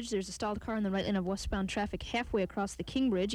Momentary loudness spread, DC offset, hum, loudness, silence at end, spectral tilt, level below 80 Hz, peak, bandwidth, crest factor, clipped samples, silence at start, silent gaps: 5 LU; under 0.1%; none; -34 LUFS; 0 s; -5 dB/octave; -48 dBFS; -22 dBFS; 13 kHz; 12 dB; under 0.1%; 0 s; none